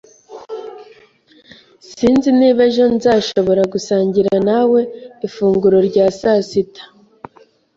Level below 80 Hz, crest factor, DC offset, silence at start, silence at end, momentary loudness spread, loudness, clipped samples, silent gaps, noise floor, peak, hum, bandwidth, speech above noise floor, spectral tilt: -52 dBFS; 14 dB; under 0.1%; 0.3 s; 0.9 s; 16 LU; -14 LUFS; under 0.1%; none; -50 dBFS; -2 dBFS; none; 7.8 kHz; 36 dB; -6 dB/octave